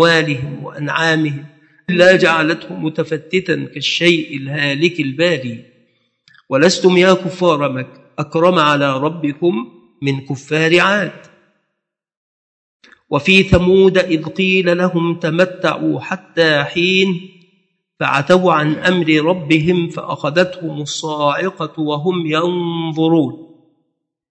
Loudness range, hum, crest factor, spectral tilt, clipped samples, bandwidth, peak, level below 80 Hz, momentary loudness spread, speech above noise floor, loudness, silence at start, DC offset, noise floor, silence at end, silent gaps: 4 LU; none; 16 dB; -5.5 dB/octave; under 0.1%; 9 kHz; 0 dBFS; -44 dBFS; 11 LU; 62 dB; -15 LUFS; 0 s; under 0.1%; -76 dBFS; 0.85 s; 12.17-12.80 s